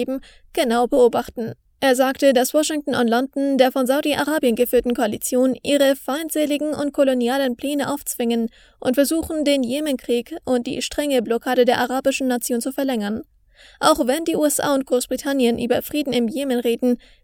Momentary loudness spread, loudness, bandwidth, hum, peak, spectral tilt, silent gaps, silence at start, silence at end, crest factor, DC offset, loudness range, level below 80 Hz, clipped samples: 7 LU; -20 LUFS; over 20 kHz; none; 0 dBFS; -3.5 dB/octave; none; 0 s; 0.3 s; 20 dB; under 0.1%; 3 LU; -52 dBFS; under 0.1%